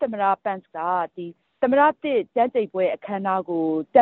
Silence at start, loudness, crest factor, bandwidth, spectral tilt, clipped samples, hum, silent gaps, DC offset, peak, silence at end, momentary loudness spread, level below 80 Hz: 0 s; -23 LUFS; 18 dB; 4.2 kHz; -4.5 dB/octave; under 0.1%; none; none; under 0.1%; -4 dBFS; 0 s; 10 LU; -70 dBFS